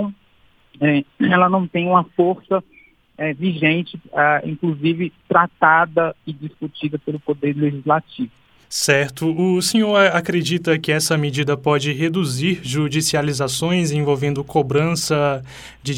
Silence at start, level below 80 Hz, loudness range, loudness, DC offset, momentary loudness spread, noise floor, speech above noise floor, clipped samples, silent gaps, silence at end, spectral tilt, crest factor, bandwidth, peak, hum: 0 s; -54 dBFS; 3 LU; -18 LUFS; under 0.1%; 11 LU; -55 dBFS; 36 dB; under 0.1%; none; 0 s; -5 dB/octave; 18 dB; 17 kHz; 0 dBFS; none